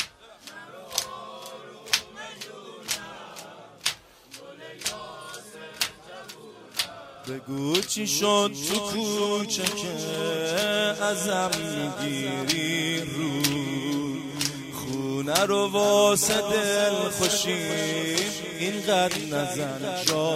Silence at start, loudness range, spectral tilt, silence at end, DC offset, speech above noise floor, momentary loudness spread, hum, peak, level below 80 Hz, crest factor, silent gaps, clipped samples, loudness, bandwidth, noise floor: 0 s; 11 LU; -3 dB/octave; 0 s; under 0.1%; 22 dB; 19 LU; none; -2 dBFS; -62 dBFS; 26 dB; none; under 0.1%; -26 LUFS; 16 kHz; -48 dBFS